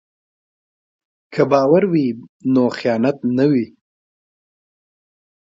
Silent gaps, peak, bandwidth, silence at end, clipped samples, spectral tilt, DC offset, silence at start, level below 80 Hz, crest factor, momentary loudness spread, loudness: 2.29-2.40 s; -2 dBFS; 7.6 kHz; 1.85 s; under 0.1%; -8 dB/octave; under 0.1%; 1.3 s; -64 dBFS; 18 dB; 11 LU; -17 LUFS